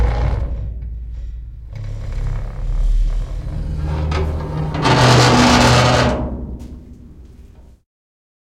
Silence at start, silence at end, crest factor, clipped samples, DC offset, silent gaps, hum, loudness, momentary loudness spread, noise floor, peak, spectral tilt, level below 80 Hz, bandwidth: 0 s; 0.9 s; 18 dB; under 0.1%; under 0.1%; none; none; -16 LUFS; 21 LU; -42 dBFS; 0 dBFS; -5 dB/octave; -24 dBFS; 14.5 kHz